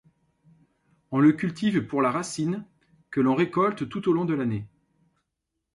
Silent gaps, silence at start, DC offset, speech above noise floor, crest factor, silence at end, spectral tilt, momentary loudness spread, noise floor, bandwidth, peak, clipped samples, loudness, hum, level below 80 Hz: none; 1.1 s; under 0.1%; 58 dB; 18 dB; 1.1 s; -6.5 dB/octave; 10 LU; -82 dBFS; 11.5 kHz; -10 dBFS; under 0.1%; -25 LUFS; none; -64 dBFS